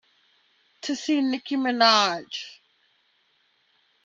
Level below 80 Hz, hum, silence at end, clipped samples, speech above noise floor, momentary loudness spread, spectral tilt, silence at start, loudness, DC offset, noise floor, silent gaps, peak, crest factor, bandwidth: -82 dBFS; none; 1.5 s; under 0.1%; 44 dB; 18 LU; -2.5 dB/octave; 0.85 s; -23 LUFS; under 0.1%; -67 dBFS; none; -6 dBFS; 22 dB; 7.8 kHz